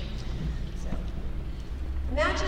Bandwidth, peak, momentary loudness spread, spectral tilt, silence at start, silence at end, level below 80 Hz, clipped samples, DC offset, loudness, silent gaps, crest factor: 9.8 kHz; -14 dBFS; 10 LU; -5.5 dB/octave; 0 s; 0 s; -32 dBFS; under 0.1%; under 0.1%; -34 LUFS; none; 16 dB